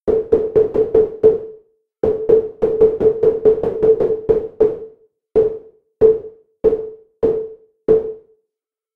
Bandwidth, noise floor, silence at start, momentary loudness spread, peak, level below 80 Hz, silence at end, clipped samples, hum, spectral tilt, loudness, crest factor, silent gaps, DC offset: 3.3 kHz; -83 dBFS; 0.05 s; 10 LU; 0 dBFS; -44 dBFS; 0.75 s; under 0.1%; none; -10 dB/octave; -17 LUFS; 16 dB; none; under 0.1%